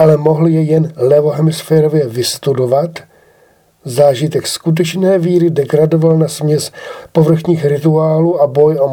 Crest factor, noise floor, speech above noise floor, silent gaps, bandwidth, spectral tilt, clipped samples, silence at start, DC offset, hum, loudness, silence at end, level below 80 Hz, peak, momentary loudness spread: 12 dB; -50 dBFS; 39 dB; none; 17.5 kHz; -6.5 dB/octave; under 0.1%; 0 s; under 0.1%; none; -12 LUFS; 0 s; -54 dBFS; 0 dBFS; 6 LU